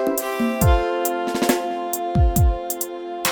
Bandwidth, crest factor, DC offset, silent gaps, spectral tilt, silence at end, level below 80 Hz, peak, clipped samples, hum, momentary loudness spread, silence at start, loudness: over 20 kHz; 16 dB; under 0.1%; none; -5 dB/octave; 0 s; -26 dBFS; -4 dBFS; under 0.1%; none; 7 LU; 0 s; -21 LUFS